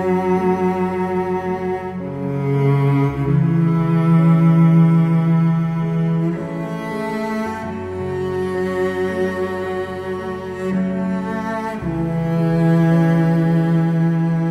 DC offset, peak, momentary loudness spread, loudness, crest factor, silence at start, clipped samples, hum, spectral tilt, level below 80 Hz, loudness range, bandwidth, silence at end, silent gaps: under 0.1%; -4 dBFS; 11 LU; -18 LUFS; 14 dB; 0 s; under 0.1%; none; -9.5 dB/octave; -46 dBFS; 7 LU; 6.2 kHz; 0 s; none